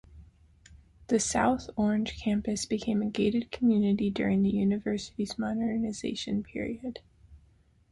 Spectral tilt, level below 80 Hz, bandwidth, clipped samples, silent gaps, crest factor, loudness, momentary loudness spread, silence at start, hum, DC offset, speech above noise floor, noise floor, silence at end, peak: -5 dB/octave; -54 dBFS; 11.5 kHz; under 0.1%; none; 18 dB; -29 LUFS; 9 LU; 0.1 s; none; under 0.1%; 34 dB; -63 dBFS; 0.55 s; -12 dBFS